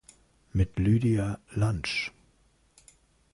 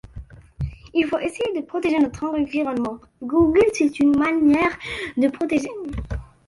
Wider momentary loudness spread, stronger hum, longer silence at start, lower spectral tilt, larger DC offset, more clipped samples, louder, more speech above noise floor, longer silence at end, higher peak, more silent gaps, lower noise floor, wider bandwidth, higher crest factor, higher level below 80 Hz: second, 8 LU vs 14 LU; neither; first, 0.55 s vs 0.05 s; about the same, -6.5 dB/octave vs -6 dB/octave; neither; neither; second, -28 LUFS vs -21 LUFS; first, 39 dB vs 20 dB; first, 1.25 s vs 0.2 s; second, -14 dBFS vs -6 dBFS; neither; first, -65 dBFS vs -40 dBFS; about the same, 11.5 kHz vs 11.5 kHz; about the same, 16 dB vs 14 dB; about the same, -44 dBFS vs -40 dBFS